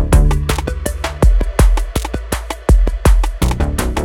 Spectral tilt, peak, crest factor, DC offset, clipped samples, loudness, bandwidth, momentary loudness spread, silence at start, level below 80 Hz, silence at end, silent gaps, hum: -5.5 dB/octave; 0 dBFS; 12 dB; under 0.1%; under 0.1%; -17 LUFS; 16.5 kHz; 8 LU; 0 s; -14 dBFS; 0 s; none; none